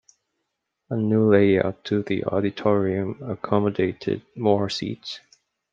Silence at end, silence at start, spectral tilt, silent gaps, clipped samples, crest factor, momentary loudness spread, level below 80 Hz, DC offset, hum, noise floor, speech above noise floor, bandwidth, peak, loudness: 0.55 s; 0.9 s; -7.5 dB/octave; none; under 0.1%; 20 dB; 13 LU; -62 dBFS; under 0.1%; none; -79 dBFS; 57 dB; 7.6 kHz; -4 dBFS; -23 LUFS